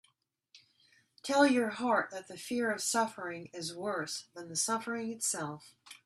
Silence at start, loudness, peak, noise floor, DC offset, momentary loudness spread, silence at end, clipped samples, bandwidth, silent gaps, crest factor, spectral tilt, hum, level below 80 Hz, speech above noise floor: 0.55 s; -33 LUFS; -14 dBFS; -74 dBFS; under 0.1%; 14 LU; 0.1 s; under 0.1%; 14 kHz; none; 22 dB; -2.5 dB/octave; none; -80 dBFS; 40 dB